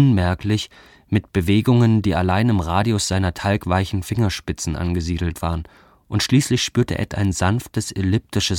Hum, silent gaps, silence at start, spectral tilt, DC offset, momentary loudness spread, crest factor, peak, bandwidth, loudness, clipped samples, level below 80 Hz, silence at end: none; none; 0 s; -5.5 dB/octave; under 0.1%; 9 LU; 16 dB; -4 dBFS; 17 kHz; -20 LUFS; under 0.1%; -38 dBFS; 0 s